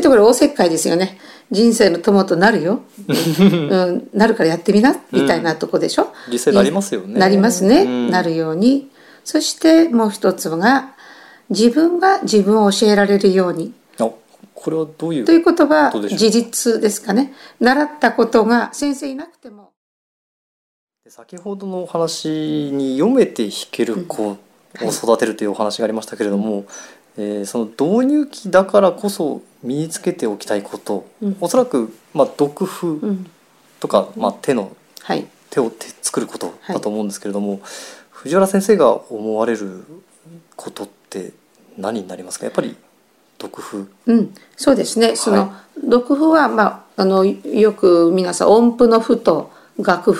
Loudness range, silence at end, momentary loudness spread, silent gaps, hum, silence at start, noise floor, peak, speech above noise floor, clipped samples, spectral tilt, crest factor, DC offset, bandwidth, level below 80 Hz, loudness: 9 LU; 0 s; 15 LU; 19.77-20.87 s; none; 0 s; -56 dBFS; 0 dBFS; 40 dB; under 0.1%; -5 dB/octave; 16 dB; under 0.1%; 16 kHz; -56 dBFS; -16 LUFS